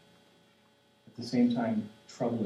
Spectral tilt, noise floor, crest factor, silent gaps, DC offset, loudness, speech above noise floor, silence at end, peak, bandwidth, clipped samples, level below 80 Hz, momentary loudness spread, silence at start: -7 dB/octave; -65 dBFS; 16 dB; none; under 0.1%; -31 LUFS; 35 dB; 0 s; -18 dBFS; 10 kHz; under 0.1%; -78 dBFS; 18 LU; 1.2 s